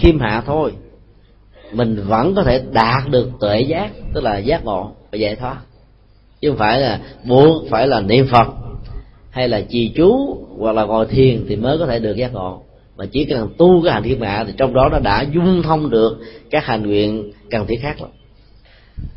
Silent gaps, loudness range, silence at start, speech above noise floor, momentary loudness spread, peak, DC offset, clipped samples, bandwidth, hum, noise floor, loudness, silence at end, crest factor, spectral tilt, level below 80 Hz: none; 5 LU; 0 s; 33 dB; 14 LU; 0 dBFS; under 0.1%; under 0.1%; 5.8 kHz; none; -49 dBFS; -16 LUFS; 0.05 s; 16 dB; -9.5 dB/octave; -32 dBFS